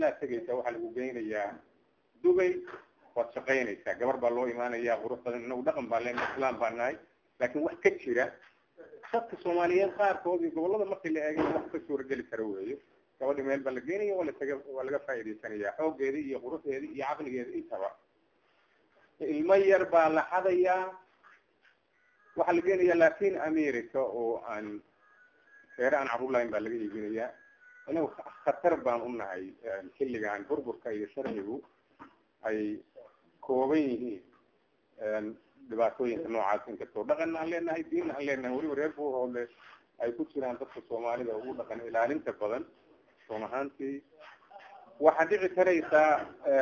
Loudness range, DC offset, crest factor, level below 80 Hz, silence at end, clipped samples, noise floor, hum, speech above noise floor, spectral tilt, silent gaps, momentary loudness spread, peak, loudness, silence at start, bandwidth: 7 LU; under 0.1%; 24 dB; -70 dBFS; 0 s; under 0.1%; -71 dBFS; none; 40 dB; -6 dB/octave; none; 13 LU; -8 dBFS; -32 LUFS; 0 s; 7 kHz